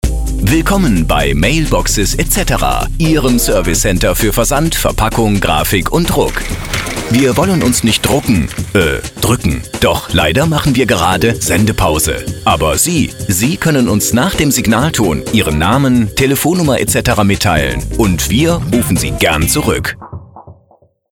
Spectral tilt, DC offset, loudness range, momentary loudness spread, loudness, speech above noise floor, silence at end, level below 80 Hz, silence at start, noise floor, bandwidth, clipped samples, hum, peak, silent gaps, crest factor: -4.5 dB/octave; under 0.1%; 1 LU; 4 LU; -12 LUFS; 38 dB; 0.6 s; -22 dBFS; 0.05 s; -50 dBFS; 19 kHz; under 0.1%; none; 0 dBFS; none; 12 dB